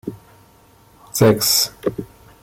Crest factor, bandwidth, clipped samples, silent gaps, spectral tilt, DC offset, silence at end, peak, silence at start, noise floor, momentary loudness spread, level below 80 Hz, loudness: 18 dB; 16.5 kHz; under 0.1%; none; -3.5 dB/octave; under 0.1%; 0.4 s; -2 dBFS; 0.05 s; -51 dBFS; 19 LU; -50 dBFS; -17 LUFS